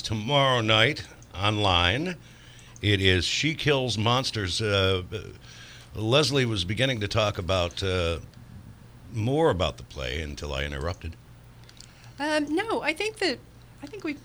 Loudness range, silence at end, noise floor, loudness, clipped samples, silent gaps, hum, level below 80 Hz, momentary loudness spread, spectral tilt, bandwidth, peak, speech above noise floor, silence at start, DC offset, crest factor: 6 LU; 0.05 s; -49 dBFS; -25 LUFS; under 0.1%; none; none; -46 dBFS; 17 LU; -4.5 dB/octave; over 20 kHz; -6 dBFS; 23 dB; 0 s; under 0.1%; 20 dB